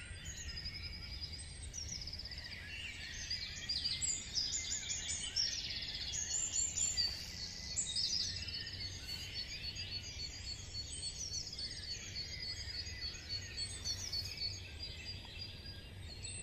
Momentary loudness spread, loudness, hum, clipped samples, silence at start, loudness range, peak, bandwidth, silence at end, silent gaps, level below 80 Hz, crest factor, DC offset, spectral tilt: 11 LU; -40 LUFS; none; under 0.1%; 0 s; 6 LU; -24 dBFS; 15.5 kHz; 0 s; none; -54 dBFS; 18 dB; under 0.1%; -0.5 dB/octave